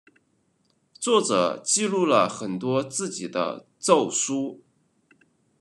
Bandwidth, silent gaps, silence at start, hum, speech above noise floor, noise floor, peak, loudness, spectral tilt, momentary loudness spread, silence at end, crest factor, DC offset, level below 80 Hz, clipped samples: 12 kHz; none; 1 s; none; 45 dB; -68 dBFS; -4 dBFS; -24 LUFS; -3.5 dB/octave; 9 LU; 1.05 s; 22 dB; under 0.1%; -78 dBFS; under 0.1%